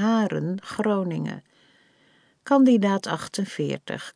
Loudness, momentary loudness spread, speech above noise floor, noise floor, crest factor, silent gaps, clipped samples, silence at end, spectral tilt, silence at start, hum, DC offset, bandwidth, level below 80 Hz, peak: -24 LUFS; 13 LU; 38 dB; -61 dBFS; 16 dB; none; under 0.1%; 0.05 s; -6 dB/octave; 0 s; none; under 0.1%; 10.5 kHz; -70 dBFS; -8 dBFS